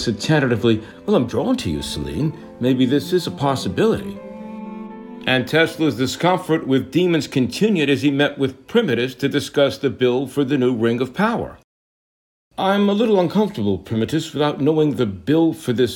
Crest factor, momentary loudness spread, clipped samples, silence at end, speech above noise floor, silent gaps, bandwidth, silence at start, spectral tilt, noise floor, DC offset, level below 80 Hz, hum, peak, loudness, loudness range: 16 dB; 8 LU; under 0.1%; 0 s; over 71 dB; 11.64-12.51 s; 17.5 kHz; 0 s; -6 dB/octave; under -90 dBFS; under 0.1%; -50 dBFS; none; -4 dBFS; -19 LUFS; 2 LU